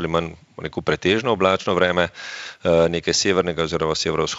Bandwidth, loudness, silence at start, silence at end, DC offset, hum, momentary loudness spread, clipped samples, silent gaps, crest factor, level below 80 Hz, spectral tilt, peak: 8 kHz; -20 LUFS; 0 s; 0 s; under 0.1%; none; 13 LU; under 0.1%; none; 20 dB; -48 dBFS; -4 dB/octave; -2 dBFS